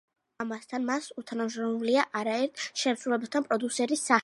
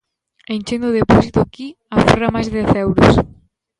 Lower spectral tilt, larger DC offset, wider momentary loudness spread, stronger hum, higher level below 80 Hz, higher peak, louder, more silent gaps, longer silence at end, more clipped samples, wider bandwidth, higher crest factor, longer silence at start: second, -3 dB/octave vs -7 dB/octave; neither; second, 8 LU vs 13 LU; neither; second, -82 dBFS vs -32 dBFS; second, -6 dBFS vs 0 dBFS; second, -30 LUFS vs -15 LUFS; neither; second, 0 s vs 0.55 s; neither; about the same, 11.5 kHz vs 11.5 kHz; first, 22 dB vs 16 dB; about the same, 0.4 s vs 0.5 s